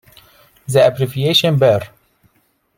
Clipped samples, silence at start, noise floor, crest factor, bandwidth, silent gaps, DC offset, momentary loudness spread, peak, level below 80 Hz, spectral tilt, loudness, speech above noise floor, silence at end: under 0.1%; 0.7 s; -62 dBFS; 16 dB; 16.5 kHz; none; under 0.1%; 15 LU; -2 dBFS; -54 dBFS; -5.5 dB/octave; -14 LUFS; 48 dB; 0.9 s